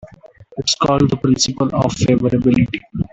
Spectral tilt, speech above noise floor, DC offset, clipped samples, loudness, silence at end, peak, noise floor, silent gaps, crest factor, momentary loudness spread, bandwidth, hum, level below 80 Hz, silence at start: -5 dB/octave; 27 dB; under 0.1%; under 0.1%; -16 LUFS; 0.1 s; -2 dBFS; -43 dBFS; none; 14 dB; 7 LU; 8.4 kHz; none; -40 dBFS; 0.05 s